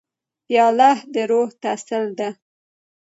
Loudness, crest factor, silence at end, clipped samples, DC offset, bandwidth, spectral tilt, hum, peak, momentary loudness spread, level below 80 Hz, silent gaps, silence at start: -19 LUFS; 18 dB; 0.75 s; under 0.1%; under 0.1%; 8 kHz; -4 dB/octave; none; -4 dBFS; 12 LU; -78 dBFS; none; 0.5 s